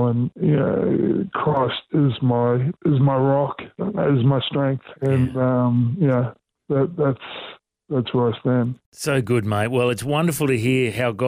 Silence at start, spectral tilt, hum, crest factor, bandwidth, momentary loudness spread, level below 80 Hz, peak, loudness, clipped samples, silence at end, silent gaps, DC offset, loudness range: 0 s; -7 dB/octave; none; 12 dB; 16 kHz; 7 LU; -56 dBFS; -8 dBFS; -21 LUFS; under 0.1%; 0 s; 8.86-8.92 s; under 0.1%; 3 LU